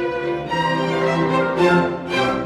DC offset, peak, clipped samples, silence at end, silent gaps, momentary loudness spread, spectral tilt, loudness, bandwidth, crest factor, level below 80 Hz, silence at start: under 0.1%; -4 dBFS; under 0.1%; 0 s; none; 6 LU; -6 dB/octave; -19 LUFS; 12 kHz; 14 dB; -48 dBFS; 0 s